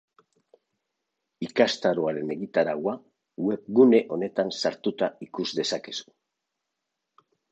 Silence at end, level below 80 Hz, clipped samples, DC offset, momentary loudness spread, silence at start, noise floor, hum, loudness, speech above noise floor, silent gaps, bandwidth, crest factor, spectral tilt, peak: 1.5 s; -74 dBFS; under 0.1%; under 0.1%; 13 LU; 1.4 s; -83 dBFS; none; -25 LUFS; 58 dB; none; 8.4 kHz; 22 dB; -5 dB/octave; -4 dBFS